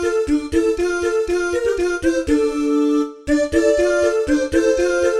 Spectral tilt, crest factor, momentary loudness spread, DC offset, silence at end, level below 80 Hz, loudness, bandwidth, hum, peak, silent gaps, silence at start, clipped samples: -4.5 dB/octave; 14 dB; 4 LU; under 0.1%; 0 s; -38 dBFS; -18 LUFS; 12.5 kHz; none; -4 dBFS; none; 0 s; under 0.1%